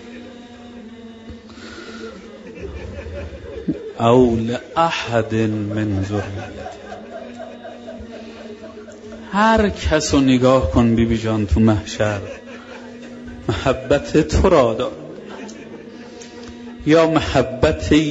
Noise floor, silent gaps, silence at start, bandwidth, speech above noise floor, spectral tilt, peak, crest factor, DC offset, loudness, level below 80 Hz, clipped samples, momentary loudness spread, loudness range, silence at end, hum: -38 dBFS; none; 0 s; 8 kHz; 21 dB; -6 dB/octave; -2 dBFS; 18 dB; under 0.1%; -18 LUFS; -34 dBFS; under 0.1%; 22 LU; 14 LU; 0 s; none